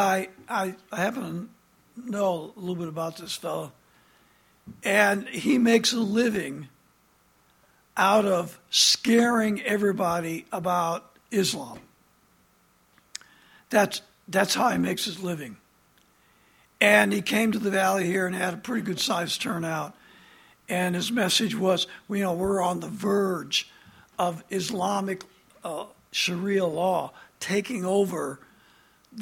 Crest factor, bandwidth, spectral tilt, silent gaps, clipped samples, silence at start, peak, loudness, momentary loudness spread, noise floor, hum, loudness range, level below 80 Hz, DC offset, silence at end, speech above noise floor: 24 dB; 17 kHz; -3.5 dB/octave; none; under 0.1%; 0 s; -2 dBFS; -25 LUFS; 15 LU; -63 dBFS; none; 7 LU; -66 dBFS; under 0.1%; 0 s; 38 dB